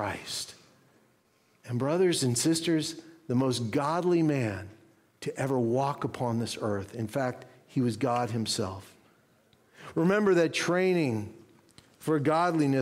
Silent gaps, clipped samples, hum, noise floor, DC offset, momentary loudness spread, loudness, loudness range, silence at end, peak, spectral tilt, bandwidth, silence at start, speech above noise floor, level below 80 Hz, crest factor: none; under 0.1%; none; -67 dBFS; under 0.1%; 13 LU; -29 LUFS; 4 LU; 0 s; -14 dBFS; -5 dB/octave; 16 kHz; 0 s; 39 dB; -68 dBFS; 16 dB